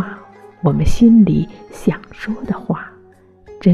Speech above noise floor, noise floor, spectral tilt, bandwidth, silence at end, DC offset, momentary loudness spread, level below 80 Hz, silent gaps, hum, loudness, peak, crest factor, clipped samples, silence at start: 32 dB; -47 dBFS; -8 dB/octave; 11.5 kHz; 0 s; under 0.1%; 17 LU; -30 dBFS; none; none; -16 LUFS; -2 dBFS; 14 dB; under 0.1%; 0 s